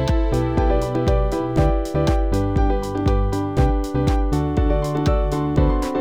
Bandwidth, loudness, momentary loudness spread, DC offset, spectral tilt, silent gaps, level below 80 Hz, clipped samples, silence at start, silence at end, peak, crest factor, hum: 12 kHz; -20 LUFS; 2 LU; 0.6%; -7.5 dB/octave; none; -22 dBFS; under 0.1%; 0 s; 0 s; -4 dBFS; 14 dB; none